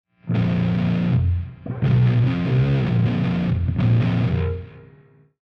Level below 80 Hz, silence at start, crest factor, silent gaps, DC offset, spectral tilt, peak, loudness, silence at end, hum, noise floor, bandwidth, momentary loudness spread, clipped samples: -40 dBFS; 0.25 s; 12 dB; none; under 0.1%; -10 dB/octave; -8 dBFS; -21 LUFS; 0.65 s; none; -52 dBFS; 5.6 kHz; 7 LU; under 0.1%